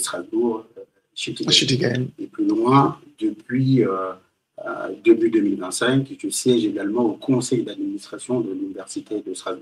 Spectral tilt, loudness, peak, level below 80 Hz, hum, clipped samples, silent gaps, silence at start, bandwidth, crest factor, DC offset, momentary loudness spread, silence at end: -5 dB/octave; -21 LUFS; -2 dBFS; -66 dBFS; none; under 0.1%; none; 0 s; 14.5 kHz; 20 dB; under 0.1%; 14 LU; 0 s